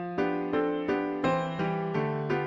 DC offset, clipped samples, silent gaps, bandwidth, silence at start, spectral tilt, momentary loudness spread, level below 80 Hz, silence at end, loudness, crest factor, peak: under 0.1%; under 0.1%; none; 7.4 kHz; 0 s; -8 dB/octave; 2 LU; -60 dBFS; 0 s; -29 LUFS; 14 dB; -16 dBFS